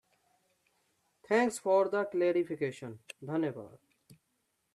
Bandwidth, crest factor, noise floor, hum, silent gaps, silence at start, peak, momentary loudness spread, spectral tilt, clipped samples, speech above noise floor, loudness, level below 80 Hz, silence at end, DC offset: 13 kHz; 20 dB; -79 dBFS; none; none; 1.3 s; -16 dBFS; 18 LU; -5.5 dB/octave; under 0.1%; 48 dB; -31 LUFS; -80 dBFS; 0.6 s; under 0.1%